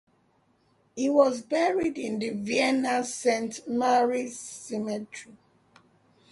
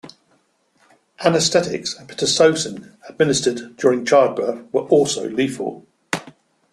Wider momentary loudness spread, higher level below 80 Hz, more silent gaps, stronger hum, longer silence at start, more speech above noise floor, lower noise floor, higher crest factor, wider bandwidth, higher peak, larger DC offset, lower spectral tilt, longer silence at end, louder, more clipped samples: about the same, 13 LU vs 12 LU; second, -70 dBFS vs -60 dBFS; neither; neither; first, 0.95 s vs 0.05 s; second, 40 dB vs 44 dB; first, -67 dBFS vs -62 dBFS; about the same, 20 dB vs 18 dB; second, 11.5 kHz vs 13 kHz; second, -8 dBFS vs -2 dBFS; neither; about the same, -4 dB/octave vs -3.5 dB/octave; first, 1 s vs 0.45 s; second, -27 LUFS vs -19 LUFS; neither